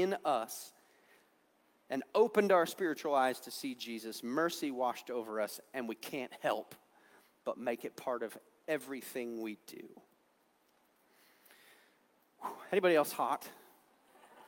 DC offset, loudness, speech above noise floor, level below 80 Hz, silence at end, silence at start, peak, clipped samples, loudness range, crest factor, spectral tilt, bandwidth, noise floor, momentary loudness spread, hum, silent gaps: under 0.1%; -36 LUFS; 37 dB; -90 dBFS; 0 s; 0 s; -16 dBFS; under 0.1%; 11 LU; 22 dB; -4 dB/octave; 18 kHz; -73 dBFS; 16 LU; none; none